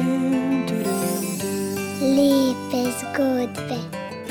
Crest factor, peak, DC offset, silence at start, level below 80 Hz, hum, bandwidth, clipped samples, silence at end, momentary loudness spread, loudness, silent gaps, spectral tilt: 14 dB; -8 dBFS; under 0.1%; 0 s; -62 dBFS; none; 17.5 kHz; under 0.1%; 0 s; 11 LU; -23 LUFS; none; -5 dB/octave